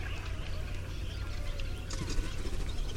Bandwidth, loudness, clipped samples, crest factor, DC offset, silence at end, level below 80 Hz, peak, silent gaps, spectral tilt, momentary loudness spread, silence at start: 15 kHz; -39 LUFS; under 0.1%; 16 dB; under 0.1%; 0 s; -36 dBFS; -18 dBFS; none; -4.5 dB/octave; 3 LU; 0 s